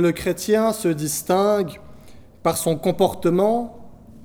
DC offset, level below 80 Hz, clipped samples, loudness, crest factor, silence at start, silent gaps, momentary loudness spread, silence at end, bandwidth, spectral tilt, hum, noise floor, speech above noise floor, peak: under 0.1%; -50 dBFS; under 0.1%; -21 LUFS; 16 dB; 0 s; none; 7 LU; 0 s; over 20 kHz; -5 dB/octave; none; -43 dBFS; 23 dB; -4 dBFS